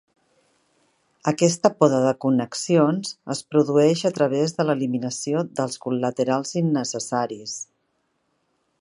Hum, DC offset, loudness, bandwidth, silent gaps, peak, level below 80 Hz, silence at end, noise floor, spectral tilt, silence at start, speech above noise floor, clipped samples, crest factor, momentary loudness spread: none; under 0.1%; -22 LUFS; 11.5 kHz; none; -2 dBFS; -70 dBFS; 1.15 s; -71 dBFS; -5.5 dB/octave; 1.25 s; 50 dB; under 0.1%; 22 dB; 10 LU